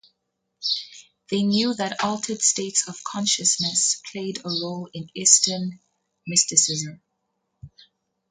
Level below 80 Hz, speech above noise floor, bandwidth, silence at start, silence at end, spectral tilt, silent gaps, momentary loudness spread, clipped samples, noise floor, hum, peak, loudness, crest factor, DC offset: -66 dBFS; 54 dB; 9.6 kHz; 0.6 s; 0.6 s; -2 dB/octave; none; 15 LU; under 0.1%; -77 dBFS; none; 0 dBFS; -21 LUFS; 26 dB; under 0.1%